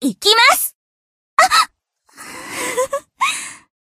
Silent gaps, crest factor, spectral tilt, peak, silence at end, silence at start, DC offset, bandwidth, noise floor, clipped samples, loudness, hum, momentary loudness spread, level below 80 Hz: 0.75-1.37 s; 18 dB; -0.5 dB/octave; 0 dBFS; 0.35 s; 0 s; under 0.1%; 15.5 kHz; -57 dBFS; under 0.1%; -15 LUFS; none; 19 LU; -60 dBFS